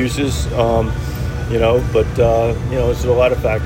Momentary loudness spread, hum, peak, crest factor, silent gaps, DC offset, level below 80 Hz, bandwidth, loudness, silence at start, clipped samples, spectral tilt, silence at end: 7 LU; none; -2 dBFS; 14 dB; none; under 0.1%; -24 dBFS; 16.5 kHz; -16 LUFS; 0 s; under 0.1%; -6.5 dB/octave; 0 s